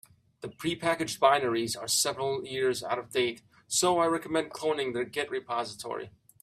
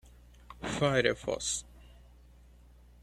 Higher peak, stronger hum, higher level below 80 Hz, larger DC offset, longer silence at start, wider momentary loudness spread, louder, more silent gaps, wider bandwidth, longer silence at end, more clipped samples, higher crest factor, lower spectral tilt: first, -8 dBFS vs -12 dBFS; second, none vs 60 Hz at -55 dBFS; second, -70 dBFS vs -54 dBFS; neither; about the same, 0.4 s vs 0.5 s; about the same, 13 LU vs 14 LU; about the same, -29 LUFS vs -31 LUFS; neither; first, 16 kHz vs 14.5 kHz; second, 0.35 s vs 1.2 s; neither; about the same, 22 dB vs 24 dB; about the same, -2.5 dB/octave vs -3.5 dB/octave